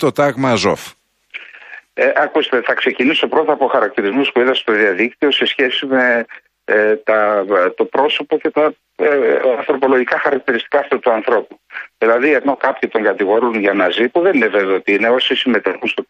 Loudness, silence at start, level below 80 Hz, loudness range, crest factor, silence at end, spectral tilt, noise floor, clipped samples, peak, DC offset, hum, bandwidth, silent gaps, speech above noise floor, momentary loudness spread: -15 LUFS; 0 s; -64 dBFS; 2 LU; 14 dB; 0.05 s; -4.5 dB/octave; -38 dBFS; under 0.1%; 0 dBFS; under 0.1%; none; 13.5 kHz; none; 23 dB; 5 LU